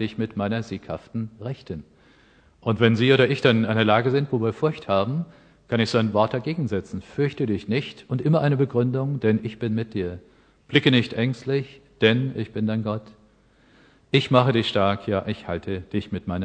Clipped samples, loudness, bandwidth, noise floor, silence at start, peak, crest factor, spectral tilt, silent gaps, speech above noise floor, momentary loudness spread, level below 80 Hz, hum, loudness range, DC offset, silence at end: under 0.1%; -23 LUFS; 9 kHz; -57 dBFS; 0 s; -2 dBFS; 22 dB; -7 dB/octave; none; 35 dB; 14 LU; -56 dBFS; none; 4 LU; under 0.1%; 0 s